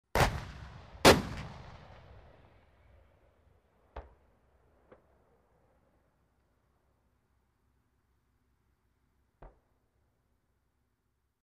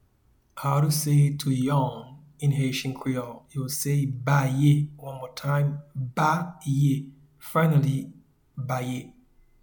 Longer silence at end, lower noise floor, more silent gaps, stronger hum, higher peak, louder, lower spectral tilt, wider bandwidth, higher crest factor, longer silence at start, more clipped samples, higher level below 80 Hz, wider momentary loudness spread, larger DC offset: first, 1.95 s vs 0.5 s; first, -80 dBFS vs -64 dBFS; neither; neither; about the same, -8 dBFS vs -8 dBFS; about the same, -27 LUFS vs -25 LUFS; second, -4 dB/octave vs -6 dB/octave; second, 15 kHz vs 19 kHz; first, 30 dB vs 16 dB; second, 0.15 s vs 0.55 s; neither; first, -50 dBFS vs -58 dBFS; first, 29 LU vs 15 LU; neither